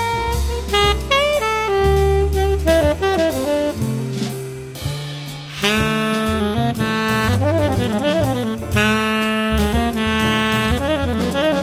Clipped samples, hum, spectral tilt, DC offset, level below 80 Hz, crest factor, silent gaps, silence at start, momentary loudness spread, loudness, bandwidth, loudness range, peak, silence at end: under 0.1%; none; -5 dB/octave; under 0.1%; -28 dBFS; 18 dB; none; 0 s; 8 LU; -18 LUFS; 16 kHz; 4 LU; 0 dBFS; 0 s